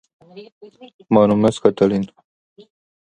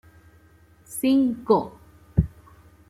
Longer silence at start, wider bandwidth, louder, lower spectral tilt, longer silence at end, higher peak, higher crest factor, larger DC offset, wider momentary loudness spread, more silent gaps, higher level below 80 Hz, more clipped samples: second, 0.35 s vs 0.9 s; second, 9.6 kHz vs 15.5 kHz; first, -17 LUFS vs -23 LUFS; about the same, -7.5 dB/octave vs -7 dB/octave; first, 1 s vs 0.65 s; first, 0 dBFS vs -4 dBFS; about the same, 20 dB vs 22 dB; neither; second, 9 LU vs 13 LU; first, 0.52-0.61 s, 0.94-0.99 s vs none; second, -54 dBFS vs -42 dBFS; neither